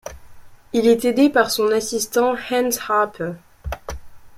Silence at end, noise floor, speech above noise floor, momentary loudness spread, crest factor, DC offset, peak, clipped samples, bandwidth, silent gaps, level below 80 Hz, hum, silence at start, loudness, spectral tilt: 0 s; -40 dBFS; 22 dB; 18 LU; 18 dB; under 0.1%; -4 dBFS; under 0.1%; 16 kHz; none; -42 dBFS; none; 0.05 s; -19 LUFS; -3.5 dB/octave